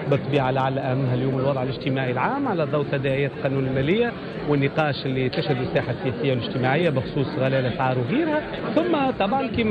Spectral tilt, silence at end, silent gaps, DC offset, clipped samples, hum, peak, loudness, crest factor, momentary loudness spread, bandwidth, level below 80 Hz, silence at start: -9 dB/octave; 0 s; none; under 0.1%; under 0.1%; none; -8 dBFS; -23 LUFS; 14 dB; 4 LU; 5 kHz; -50 dBFS; 0 s